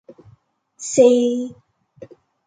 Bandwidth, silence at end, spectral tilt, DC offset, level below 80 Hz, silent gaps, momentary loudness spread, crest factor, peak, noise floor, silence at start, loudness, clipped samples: 9.4 kHz; 0.4 s; -4.5 dB/octave; under 0.1%; -68 dBFS; none; 19 LU; 20 dB; -2 dBFS; -56 dBFS; 0.8 s; -16 LUFS; under 0.1%